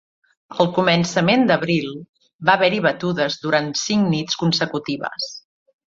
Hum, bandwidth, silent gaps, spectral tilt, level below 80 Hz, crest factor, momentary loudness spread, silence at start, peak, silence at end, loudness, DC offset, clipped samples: none; 7.8 kHz; 2.09-2.13 s, 2.34-2.39 s; -4.5 dB/octave; -60 dBFS; 18 dB; 12 LU; 0.5 s; -2 dBFS; 0.55 s; -19 LUFS; under 0.1%; under 0.1%